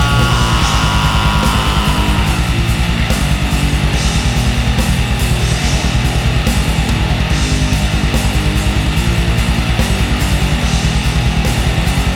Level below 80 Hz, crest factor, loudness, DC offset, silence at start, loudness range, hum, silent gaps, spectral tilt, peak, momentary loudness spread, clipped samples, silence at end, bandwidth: -16 dBFS; 12 dB; -14 LUFS; under 0.1%; 0 s; 1 LU; none; none; -4.5 dB/octave; 0 dBFS; 2 LU; under 0.1%; 0 s; 17 kHz